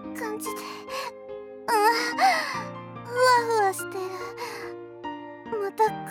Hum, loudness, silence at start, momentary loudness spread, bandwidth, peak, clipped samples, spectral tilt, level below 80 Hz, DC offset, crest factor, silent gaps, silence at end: none; -26 LUFS; 0 s; 17 LU; 19 kHz; -8 dBFS; under 0.1%; -3 dB/octave; -68 dBFS; under 0.1%; 18 dB; none; 0 s